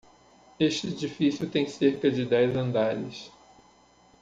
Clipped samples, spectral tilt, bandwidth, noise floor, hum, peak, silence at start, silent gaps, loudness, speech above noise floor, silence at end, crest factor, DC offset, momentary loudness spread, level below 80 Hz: under 0.1%; -6 dB/octave; 9 kHz; -59 dBFS; none; -10 dBFS; 0.6 s; none; -27 LUFS; 33 dB; 0.95 s; 16 dB; under 0.1%; 11 LU; -64 dBFS